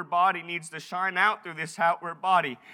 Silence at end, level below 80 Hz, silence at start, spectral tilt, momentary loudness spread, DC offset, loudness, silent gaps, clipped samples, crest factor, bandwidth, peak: 0 s; under -90 dBFS; 0 s; -3.5 dB/octave; 10 LU; under 0.1%; -27 LUFS; none; under 0.1%; 20 dB; 14.5 kHz; -8 dBFS